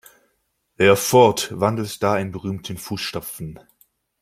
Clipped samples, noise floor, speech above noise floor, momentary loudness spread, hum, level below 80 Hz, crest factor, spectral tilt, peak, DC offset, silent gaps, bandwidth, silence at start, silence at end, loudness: under 0.1%; -70 dBFS; 50 dB; 16 LU; none; -56 dBFS; 20 dB; -4.5 dB/octave; -2 dBFS; under 0.1%; none; 16.5 kHz; 0.8 s; 0.65 s; -20 LUFS